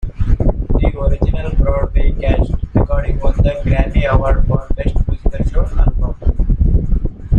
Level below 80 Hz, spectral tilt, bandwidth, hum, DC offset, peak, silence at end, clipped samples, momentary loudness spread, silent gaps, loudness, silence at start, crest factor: -14 dBFS; -9.5 dB/octave; 4.1 kHz; none; under 0.1%; -2 dBFS; 0 s; under 0.1%; 5 LU; none; -17 LUFS; 0 s; 12 dB